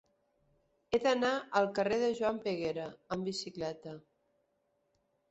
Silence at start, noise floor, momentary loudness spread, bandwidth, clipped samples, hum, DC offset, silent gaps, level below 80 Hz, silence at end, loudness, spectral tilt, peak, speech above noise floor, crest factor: 0.9 s; -78 dBFS; 11 LU; 8 kHz; under 0.1%; none; under 0.1%; none; -70 dBFS; 1.3 s; -34 LUFS; -3.5 dB/octave; -14 dBFS; 45 dB; 22 dB